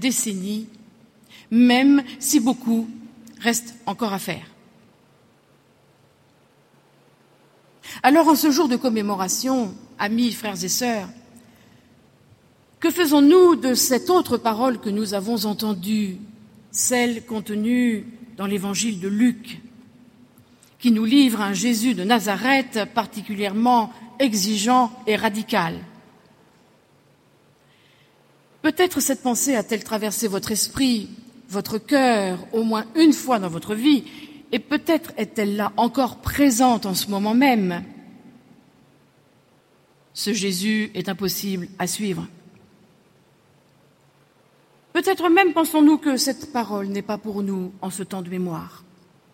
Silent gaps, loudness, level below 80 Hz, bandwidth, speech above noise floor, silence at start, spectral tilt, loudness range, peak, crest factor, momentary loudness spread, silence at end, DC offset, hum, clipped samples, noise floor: none; -21 LUFS; -56 dBFS; 16.5 kHz; 38 dB; 0 s; -3.5 dB/octave; 9 LU; 0 dBFS; 22 dB; 13 LU; 0.65 s; under 0.1%; none; under 0.1%; -58 dBFS